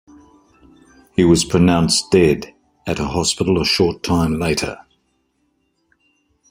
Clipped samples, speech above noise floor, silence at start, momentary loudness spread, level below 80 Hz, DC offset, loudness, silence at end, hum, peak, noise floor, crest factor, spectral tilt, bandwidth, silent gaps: under 0.1%; 50 dB; 1.2 s; 12 LU; -42 dBFS; under 0.1%; -17 LUFS; 1.75 s; none; -2 dBFS; -66 dBFS; 18 dB; -4.5 dB/octave; 16 kHz; none